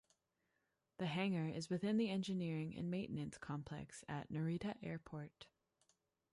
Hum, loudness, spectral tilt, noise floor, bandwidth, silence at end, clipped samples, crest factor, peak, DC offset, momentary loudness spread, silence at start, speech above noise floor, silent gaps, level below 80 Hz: none; -44 LUFS; -6.5 dB/octave; -86 dBFS; 11.5 kHz; 0.9 s; under 0.1%; 18 dB; -26 dBFS; under 0.1%; 12 LU; 1 s; 43 dB; none; -74 dBFS